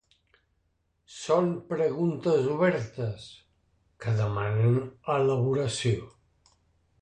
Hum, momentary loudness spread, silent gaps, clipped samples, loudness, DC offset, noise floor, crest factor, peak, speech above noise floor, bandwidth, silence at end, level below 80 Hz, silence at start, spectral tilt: none; 11 LU; none; under 0.1%; -27 LUFS; under 0.1%; -73 dBFS; 18 dB; -10 dBFS; 47 dB; 10 kHz; 0.9 s; -58 dBFS; 1.1 s; -6.5 dB/octave